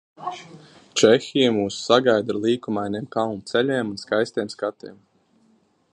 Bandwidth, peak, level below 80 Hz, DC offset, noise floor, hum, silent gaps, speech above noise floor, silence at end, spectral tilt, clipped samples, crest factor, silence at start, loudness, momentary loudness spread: 11 kHz; -2 dBFS; -64 dBFS; under 0.1%; -61 dBFS; none; none; 40 dB; 1 s; -4.5 dB/octave; under 0.1%; 22 dB; 0.2 s; -22 LUFS; 16 LU